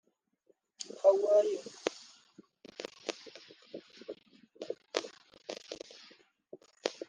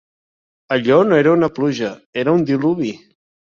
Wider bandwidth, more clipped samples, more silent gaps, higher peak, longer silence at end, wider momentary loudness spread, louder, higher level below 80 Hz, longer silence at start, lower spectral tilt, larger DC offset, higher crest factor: first, 9.8 kHz vs 7.2 kHz; neither; second, none vs 2.06-2.13 s; second, -10 dBFS vs -2 dBFS; second, 0.15 s vs 0.65 s; first, 25 LU vs 11 LU; second, -33 LUFS vs -17 LUFS; second, -86 dBFS vs -58 dBFS; about the same, 0.8 s vs 0.7 s; second, -2 dB/octave vs -7 dB/octave; neither; first, 28 dB vs 16 dB